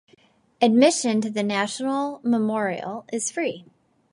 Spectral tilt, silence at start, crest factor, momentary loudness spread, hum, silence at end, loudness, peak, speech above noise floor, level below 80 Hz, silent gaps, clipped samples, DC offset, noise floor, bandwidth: -4 dB/octave; 0.6 s; 18 dB; 12 LU; none; 0.5 s; -23 LUFS; -4 dBFS; 36 dB; -74 dBFS; none; under 0.1%; under 0.1%; -59 dBFS; 11.5 kHz